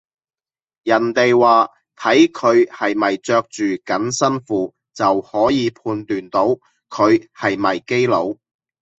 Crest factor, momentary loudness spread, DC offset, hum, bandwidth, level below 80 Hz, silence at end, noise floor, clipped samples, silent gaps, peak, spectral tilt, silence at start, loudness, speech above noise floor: 16 dB; 10 LU; under 0.1%; none; 8.2 kHz; -60 dBFS; 0.65 s; under -90 dBFS; under 0.1%; none; -2 dBFS; -5 dB/octave; 0.85 s; -17 LUFS; over 73 dB